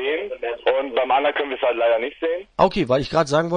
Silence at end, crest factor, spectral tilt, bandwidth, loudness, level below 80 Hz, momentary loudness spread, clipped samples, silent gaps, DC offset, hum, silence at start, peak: 0 s; 18 dB; -5.5 dB/octave; 10 kHz; -21 LUFS; -48 dBFS; 6 LU; under 0.1%; none; under 0.1%; none; 0 s; -2 dBFS